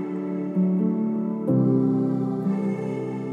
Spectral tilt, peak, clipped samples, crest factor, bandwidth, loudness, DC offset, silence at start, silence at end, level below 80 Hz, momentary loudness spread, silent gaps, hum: -11 dB/octave; -10 dBFS; under 0.1%; 14 dB; 3.7 kHz; -24 LUFS; under 0.1%; 0 s; 0 s; -72 dBFS; 8 LU; none; none